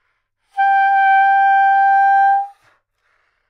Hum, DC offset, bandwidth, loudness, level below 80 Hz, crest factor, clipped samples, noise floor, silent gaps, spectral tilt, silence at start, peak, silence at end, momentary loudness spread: none; under 0.1%; 5 kHz; -13 LUFS; -80 dBFS; 10 dB; under 0.1%; -68 dBFS; none; 2 dB/octave; 0.55 s; -6 dBFS; 1 s; 8 LU